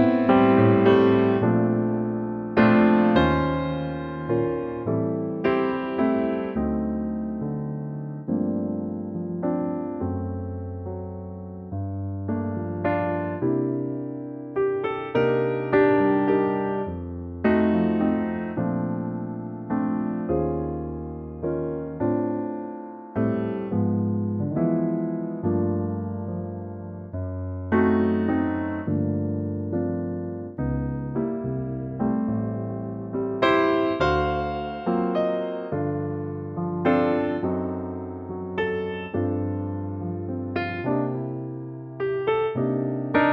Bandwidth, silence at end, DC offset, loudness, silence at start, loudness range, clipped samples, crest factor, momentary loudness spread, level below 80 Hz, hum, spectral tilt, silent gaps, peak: 6.2 kHz; 0 s; under 0.1%; -25 LUFS; 0 s; 6 LU; under 0.1%; 20 dB; 12 LU; -46 dBFS; none; -9.5 dB/octave; none; -4 dBFS